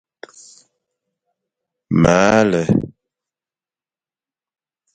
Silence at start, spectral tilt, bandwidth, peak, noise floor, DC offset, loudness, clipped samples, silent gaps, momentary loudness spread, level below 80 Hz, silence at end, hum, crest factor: 1.9 s; -6 dB/octave; 9.2 kHz; 0 dBFS; under -90 dBFS; under 0.1%; -15 LUFS; under 0.1%; none; 8 LU; -44 dBFS; 2.05 s; none; 20 dB